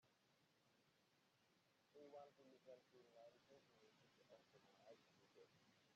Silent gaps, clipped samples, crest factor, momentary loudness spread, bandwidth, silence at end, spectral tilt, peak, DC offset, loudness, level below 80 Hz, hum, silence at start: none; under 0.1%; 20 dB; 5 LU; 7.2 kHz; 0 s; -3 dB/octave; -52 dBFS; under 0.1%; -67 LUFS; under -90 dBFS; none; 0 s